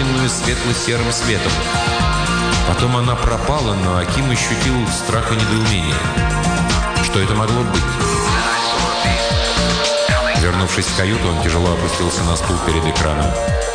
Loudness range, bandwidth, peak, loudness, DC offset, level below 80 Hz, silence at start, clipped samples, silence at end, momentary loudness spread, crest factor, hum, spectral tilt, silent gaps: 1 LU; 10 kHz; -4 dBFS; -16 LUFS; under 0.1%; -26 dBFS; 0 s; under 0.1%; 0 s; 2 LU; 12 dB; none; -4 dB/octave; none